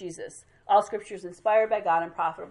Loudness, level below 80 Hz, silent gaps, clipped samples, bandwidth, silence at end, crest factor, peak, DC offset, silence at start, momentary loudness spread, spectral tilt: -26 LUFS; -68 dBFS; none; under 0.1%; 11.5 kHz; 0 s; 18 dB; -10 dBFS; under 0.1%; 0 s; 17 LU; -4 dB/octave